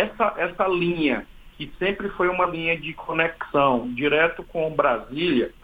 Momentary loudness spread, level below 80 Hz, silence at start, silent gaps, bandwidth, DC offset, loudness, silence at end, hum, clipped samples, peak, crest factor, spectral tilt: 7 LU; -48 dBFS; 0 s; none; 15.5 kHz; under 0.1%; -23 LUFS; 0.1 s; none; under 0.1%; -4 dBFS; 20 dB; -7.5 dB/octave